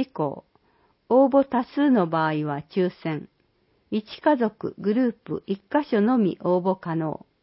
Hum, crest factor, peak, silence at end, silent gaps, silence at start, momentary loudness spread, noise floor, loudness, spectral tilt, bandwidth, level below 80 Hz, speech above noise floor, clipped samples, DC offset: none; 16 dB; -8 dBFS; 0.3 s; none; 0 s; 11 LU; -66 dBFS; -24 LUFS; -11.5 dB/octave; 5.8 kHz; -66 dBFS; 43 dB; under 0.1%; under 0.1%